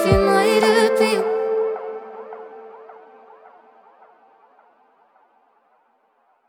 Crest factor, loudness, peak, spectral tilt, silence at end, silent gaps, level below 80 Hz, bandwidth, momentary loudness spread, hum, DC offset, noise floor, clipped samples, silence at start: 20 dB; -18 LUFS; -2 dBFS; -5 dB/octave; 3.55 s; none; -42 dBFS; 17 kHz; 24 LU; none; under 0.1%; -63 dBFS; under 0.1%; 0 s